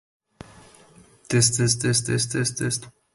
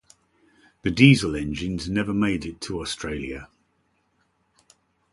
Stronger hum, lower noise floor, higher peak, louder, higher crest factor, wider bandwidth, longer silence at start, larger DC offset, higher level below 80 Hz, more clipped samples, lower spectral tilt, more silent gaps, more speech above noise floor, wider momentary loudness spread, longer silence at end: neither; second, -53 dBFS vs -69 dBFS; second, -6 dBFS vs -2 dBFS; about the same, -22 LUFS vs -23 LUFS; about the same, 20 dB vs 24 dB; about the same, 12 kHz vs 11.5 kHz; first, 1.3 s vs 0.85 s; neither; second, -54 dBFS vs -46 dBFS; neither; second, -3.5 dB/octave vs -5.5 dB/octave; neither; second, 30 dB vs 46 dB; second, 8 LU vs 16 LU; second, 0.25 s vs 1.65 s